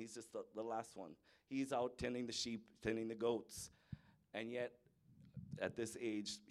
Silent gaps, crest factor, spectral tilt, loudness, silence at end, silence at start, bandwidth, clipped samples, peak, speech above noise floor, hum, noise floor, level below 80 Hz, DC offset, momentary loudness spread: none; 20 dB; -4 dB/octave; -45 LUFS; 0.05 s; 0 s; 14.5 kHz; under 0.1%; -26 dBFS; 23 dB; none; -68 dBFS; -72 dBFS; under 0.1%; 16 LU